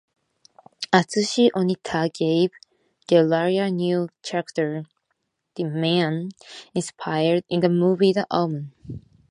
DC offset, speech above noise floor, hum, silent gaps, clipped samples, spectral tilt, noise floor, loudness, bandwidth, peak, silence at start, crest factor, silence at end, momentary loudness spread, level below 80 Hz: under 0.1%; 54 dB; none; none; under 0.1%; -6 dB/octave; -75 dBFS; -22 LUFS; 11 kHz; 0 dBFS; 0.8 s; 22 dB; 0.3 s; 15 LU; -62 dBFS